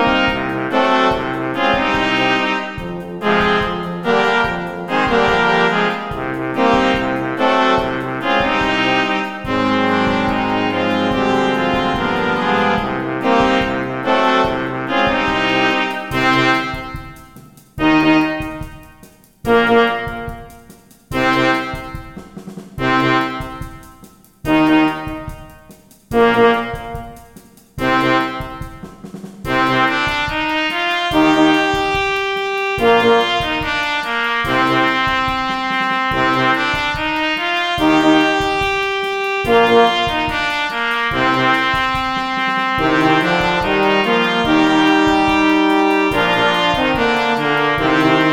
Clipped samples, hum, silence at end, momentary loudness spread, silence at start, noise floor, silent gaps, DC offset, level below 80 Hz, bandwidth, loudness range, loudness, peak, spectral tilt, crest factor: under 0.1%; none; 0 s; 13 LU; 0 s; -45 dBFS; none; 0.2%; -38 dBFS; 16.5 kHz; 5 LU; -15 LUFS; 0 dBFS; -5 dB/octave; 16 dB